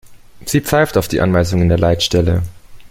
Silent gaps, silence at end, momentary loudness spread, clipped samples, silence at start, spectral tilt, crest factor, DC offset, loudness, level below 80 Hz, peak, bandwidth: none; 0.05 s; 6 LU; under 0.1%; 0.05 s; -5.5 dB/octave; 14 dB; under 0.1%; -15 LUFS; -34 dBFS; 0 dBFS; 17 kHz